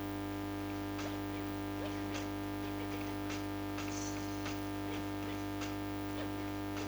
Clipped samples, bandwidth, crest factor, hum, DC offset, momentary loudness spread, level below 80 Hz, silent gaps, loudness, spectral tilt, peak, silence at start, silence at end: under 0.1%; over 20 kHz; 12 dB; 50 Hz at -45 dBFS; under 0.1%; 1 LU; -54 dBFS; none; -40 LUFS; -5 dB/octave; -26 dBFS; 0 s; 0 s